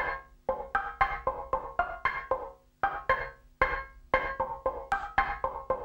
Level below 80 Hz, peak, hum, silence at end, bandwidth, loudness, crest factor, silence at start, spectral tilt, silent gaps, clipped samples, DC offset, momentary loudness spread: -48 dBFS; -8 dBFS; none; 0 s; 16 kHz; -32 LUFS; 24 dB; 0 s; -5.5 dB/octave; none; under 0.1%; under 0.1%; 6 LU